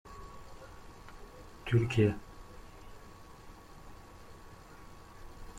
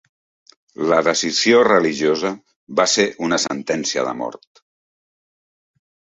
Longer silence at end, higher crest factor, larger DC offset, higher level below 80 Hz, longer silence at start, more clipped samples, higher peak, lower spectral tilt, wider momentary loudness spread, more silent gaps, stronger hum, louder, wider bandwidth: second, 0 s vs 1.8 s; about the same, 22 dB vs 18 dB; neither; first, -54 dBFS vs -62 dBFS; second, 0.05 s vs 0.8 s; neither; second, -16 dBFS vs -2 dBFS; first, -7.5 dB/octave vs -3 dB/octave; first, 24 LU vs 12 LU; second, none vs 2.56-2.67 s; neither; second, -31 LUFS vs -18 LUFS; first, 14.5 kHz vs 8.2 kHz